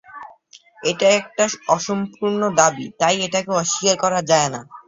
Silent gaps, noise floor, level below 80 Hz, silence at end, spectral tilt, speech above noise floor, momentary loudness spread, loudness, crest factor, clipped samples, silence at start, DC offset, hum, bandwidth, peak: none; -49 dBFS; -62 dBFS; 0.1 s; -3 dB/octave; 30 dB; 8 LU; -19 LUFS; 20 dB; under 0.1%; 0.1 s; under 0.1%; none; 8 kHz; 0 dBFS